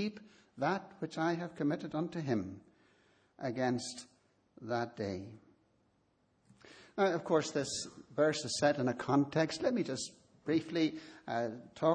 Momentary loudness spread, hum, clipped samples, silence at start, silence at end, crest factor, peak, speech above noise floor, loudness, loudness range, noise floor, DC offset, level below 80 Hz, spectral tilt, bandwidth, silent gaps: 13 LU; none; under 0.1%; 0 s; 0 s; 20 dB; -16 dBFS; 40 dB; -35 LUFS; 8 LU; -74 dBFS; under 0.1%; -74 dBFS; -5 dB/octave; 10 kHz; none